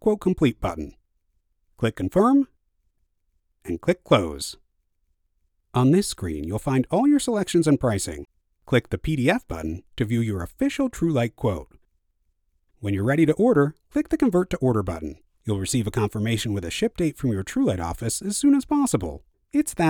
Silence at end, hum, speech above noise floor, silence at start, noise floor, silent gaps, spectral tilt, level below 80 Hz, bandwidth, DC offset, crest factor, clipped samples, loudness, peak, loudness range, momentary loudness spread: 0 s; none; 47 dB; 0 s; -70 dBFS; none; -6 dB/octave; -44 dBFS; 18.5 kHz; under 0.1%; 20 dB; under 0.1%; -23 LUFS; -4 dBFS; 4 LU; 12 LU